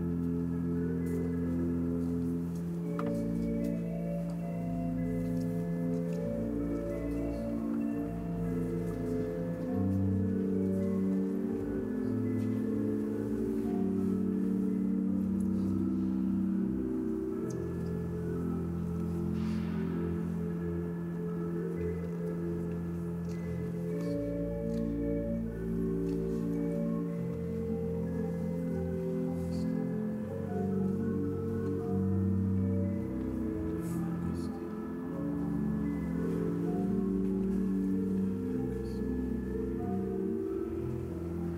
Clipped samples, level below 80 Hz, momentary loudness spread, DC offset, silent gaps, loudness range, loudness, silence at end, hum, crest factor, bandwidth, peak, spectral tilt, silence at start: under 0.1%; -50 dBFS; 5 LU; under 0.1%; none; 3 LU; -34 LUFS; 0 s; none; 12 dB; 15 kHz; -20 dBFS; -9.5 dB/octave; 0 s